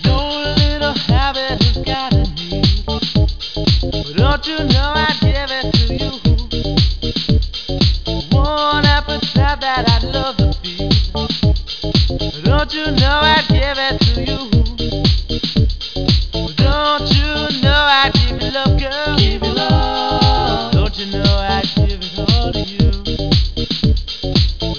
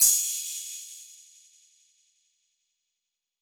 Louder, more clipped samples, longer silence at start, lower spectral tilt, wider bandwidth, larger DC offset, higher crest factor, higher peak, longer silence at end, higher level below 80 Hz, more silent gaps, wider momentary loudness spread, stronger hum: first, -15 LUFS vs -26 LUFS; neither; about the same, 0 s vs 0 s; first, -6 dB/octave vs 4.5 dB/octave; second, 5.4 kHz vs over 20 kHz; first, 1% vs under 0.1%; second, 14 dB vs 26 dB; first, 0 dBFS vs -6 dBFS; second, 0 s vs 2.25 s; first, -20 dBFS vs -76 dBFS; neither; second, 5 LU vs 25 LU; neither